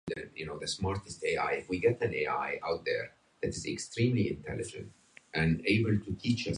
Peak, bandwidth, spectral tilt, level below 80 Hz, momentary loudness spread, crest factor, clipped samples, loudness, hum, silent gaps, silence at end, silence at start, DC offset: -16 dBFS; 11 kHz; -5.5 dB/octave; -52 dBFS; 11 LU; 18 dB; under 0.1%; -32 LUFS; none; none; 0 s; 0.05 s; under 0.1%